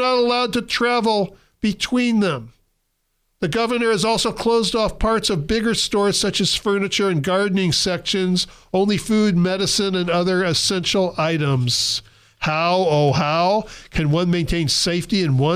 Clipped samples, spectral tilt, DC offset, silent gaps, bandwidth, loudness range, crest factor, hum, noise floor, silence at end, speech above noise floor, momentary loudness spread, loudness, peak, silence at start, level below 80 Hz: under 0.1%; -4.5 dB/octave; under 0.1%; none; 15 kHz; 2 LU; 10 dB; none; -70 dBFS; 0 s; 51 dB; 5 LU; -19 LUFS; -10 dBFS; 0 s; -40 dBFS